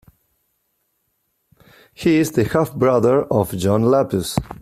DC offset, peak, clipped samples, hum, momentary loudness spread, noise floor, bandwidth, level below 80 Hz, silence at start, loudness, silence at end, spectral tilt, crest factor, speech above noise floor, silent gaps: under 0.1%; -4 dBFS; under 0.1%; none; 6 LU; -70 dBFS; 16 kHz; -46 dBFS; 2 s; -18 LUFS; 0.05 s; -6.5 dB/octave; 16 dB; 53 dB; none